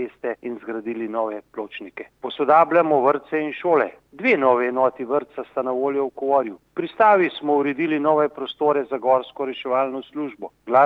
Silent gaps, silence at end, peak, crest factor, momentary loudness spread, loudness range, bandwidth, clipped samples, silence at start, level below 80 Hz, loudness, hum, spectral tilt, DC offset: none; 0 s; -4 dBFS; 18 dB; 14 LU; 3 LU; 5.8 kHz; under 0.1%; 0 s; -70 dBFS; -21 LUFS; none; -7.5 dB/octave; under 0.1%